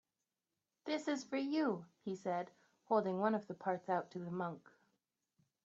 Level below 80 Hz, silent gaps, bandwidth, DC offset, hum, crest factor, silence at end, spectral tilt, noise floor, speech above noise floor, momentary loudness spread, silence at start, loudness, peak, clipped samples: -88 dBFS; none; 8 kHz; under 0.1%; none; 20 dB; 1.05 s; -5 dB/octave; under -90 dBFS; over 51 dB; 9 LU; 0.85 s; -40 LUFS; -20 dBFS; under 0.1%